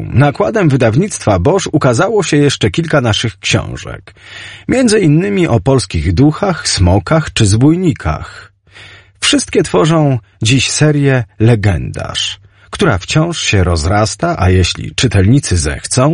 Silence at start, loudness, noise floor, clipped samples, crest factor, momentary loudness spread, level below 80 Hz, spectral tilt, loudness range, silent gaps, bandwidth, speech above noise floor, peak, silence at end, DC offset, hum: 0 s; -12 LUFS; -38 dBFS; under 0.1%; 12 dB; 9 LU; -30 dBFS; -5 dB/octave; 2 LU; none; 11 kHz; 26 dB; 0 dBFS; 0 s; under 0.1%; none